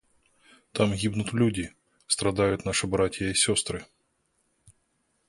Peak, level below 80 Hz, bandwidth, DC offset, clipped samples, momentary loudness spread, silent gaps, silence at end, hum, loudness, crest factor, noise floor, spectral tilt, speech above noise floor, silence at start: -8 dBFS; -50 dBFS; 11.5 kHz; under 0.1%; under 0.1%; 11 LU; none; 1.45 s; none; -26 LUFS; 20 dB; -73 dBFS; -4 dB/octave; 47 dB; 0.75 s